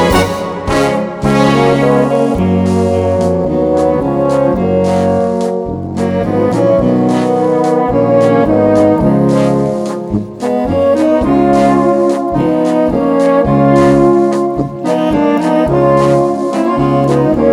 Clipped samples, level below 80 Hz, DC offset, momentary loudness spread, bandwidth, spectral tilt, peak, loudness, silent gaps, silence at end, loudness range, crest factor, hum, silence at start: under 0.1%; -34 dBFS; under 0.1%; 6 LU; 16.5 kHz; -7.5 dB/octave; 0 dBFS; -11 LUFS; none; 0 s; 2 LU; 10 dB; none; 0 s